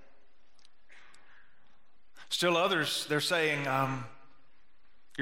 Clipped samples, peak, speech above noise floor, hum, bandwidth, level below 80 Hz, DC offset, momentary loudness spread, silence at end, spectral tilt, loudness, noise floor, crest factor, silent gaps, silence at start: under 0.1%; -14 dBFS; 41 dB; none; 16 kHz; -78 dBFS; 0.5%; 13 LU; 0 s; -3.5 dB/octave; -30 LUFS; -70 dBFS; 20 dB; none; 0.95 s